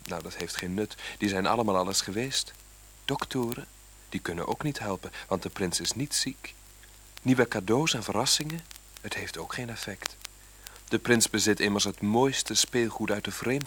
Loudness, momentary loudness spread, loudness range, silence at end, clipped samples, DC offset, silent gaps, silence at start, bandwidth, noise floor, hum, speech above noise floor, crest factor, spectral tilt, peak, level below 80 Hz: -28 LUFS; 15 LU; 6 LU; 0 s; under 0.1%; under 0.1%; none; 0 s; over 20 kHz; -52 dBFS; none; 23 dB; 24 dB; -3.5 dB/octave; -6 dBFS; -54 dBFS